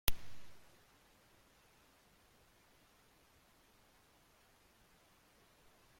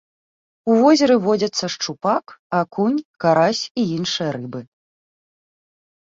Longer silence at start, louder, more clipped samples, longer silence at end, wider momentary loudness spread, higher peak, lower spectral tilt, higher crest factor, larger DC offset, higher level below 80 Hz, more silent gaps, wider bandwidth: second, 0.05 s vs 0.65 s; second, -54 LUFS vs -19 LUFS; neither; first, 5.4 s vs 1.4 s; second, 6 LU vs 11 LU; second, -10 dBFS vs -4 dBFS; second, -2 dB/octave vs -5 dB/octave; first, 36 dB vs 16 dB; neither; first, -54 dBFS vs -64 dBFS; second, none vs 2.39-2.50 s, 3.05-3.14 s, 3.71-3.75 s; first, 16.5 kHz vs 7.8 kHz